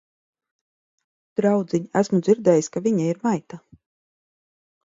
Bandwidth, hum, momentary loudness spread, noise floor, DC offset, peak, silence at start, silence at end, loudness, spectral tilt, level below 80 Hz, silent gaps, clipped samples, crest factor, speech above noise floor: 7.8 kHz; none; 7 LU; under -90 dBFS; under 0.1%; -4 dBFS; 1.4 s; 1.25 s; -22 LUFS; -7 dB/octave; -68 dBFS; none; under 0.1%; 20 dB; over 69 dB